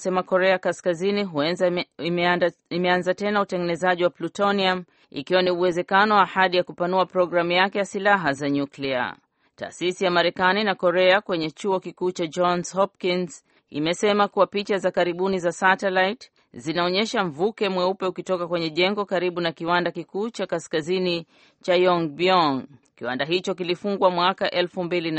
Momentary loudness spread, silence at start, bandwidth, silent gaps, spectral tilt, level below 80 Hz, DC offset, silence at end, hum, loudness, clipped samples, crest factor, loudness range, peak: 8 LU; 0 s; 8.8 kHz; none; -5 dB/octave; -66 dBFS; under 0.1%; 0 s; none; -23 LUFS; under 0.1%; 20 dB; 3 LU; -4 dBFS